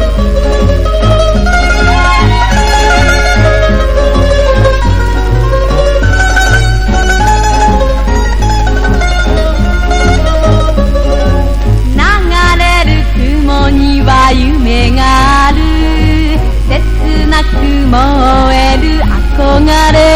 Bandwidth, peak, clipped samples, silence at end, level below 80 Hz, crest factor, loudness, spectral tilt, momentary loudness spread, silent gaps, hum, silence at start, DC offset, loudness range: 11.5 kHz; 0 dBFS; 0.7%; 0 s; -10 dBFS; 6 dB; -9 LUFS; -5.5 dB/octave; 4 LU; none; none; 0 s; under 0.1%; 2 LU